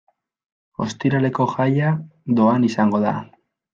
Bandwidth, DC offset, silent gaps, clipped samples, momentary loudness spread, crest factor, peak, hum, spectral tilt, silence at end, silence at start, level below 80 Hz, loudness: 7.6 kHz; under 0.1%; none; under 0.1%; 11 LU; 16 dB; -4 dBFS; none; -7.5 dB/octave; 0.5 s; 0.8 s; -62 dBFS; -20 LUFS